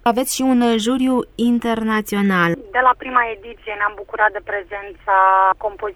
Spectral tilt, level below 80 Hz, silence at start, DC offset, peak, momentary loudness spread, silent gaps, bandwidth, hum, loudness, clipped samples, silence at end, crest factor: -4.5 dB/octave; -48 dBFS; 0.05 s; under 0.1%; -2 dBFS; 11 LU; none; 18 kHz; none; -18 LUFS; under 0.1%; 0.05 s; 16 dB